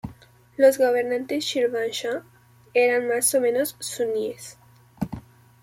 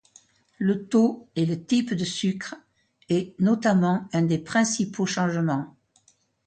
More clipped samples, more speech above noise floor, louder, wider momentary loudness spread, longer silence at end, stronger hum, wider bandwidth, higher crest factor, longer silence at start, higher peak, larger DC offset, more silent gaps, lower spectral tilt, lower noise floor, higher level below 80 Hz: neither; second, 27 dB vs 40 dB; about the same, -23 LUFS vs -24 LUFS; first, 17 LU vs 7 LU; second, 0.4 s vs 0.75 s; neither; first, 16.5 kHz vs 9.2 kHz; about the same, 18 dB vs 18 dB; second, 0.05 s vs 0.6 s; about the same, -6 dBFS vs -8 dBFS; neither; neither; second, -3 dB/octave vs -5.5 dB/octave; second, -49 dBFS vs -63 dBFS; first, -58 dBFS vs -64 dBFS